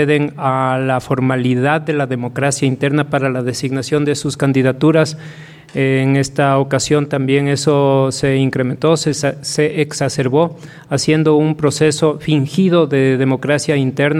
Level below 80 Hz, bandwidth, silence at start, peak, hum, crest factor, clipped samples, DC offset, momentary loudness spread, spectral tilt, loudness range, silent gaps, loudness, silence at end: -50 dBFS; 13 kHz; 0 s; -2 dBFS; none; 14 dB; under 0.1%; under 0.1%; 5 LU; -5.5 dB/octave; 2 LU; none; -15 LUFS; 0 s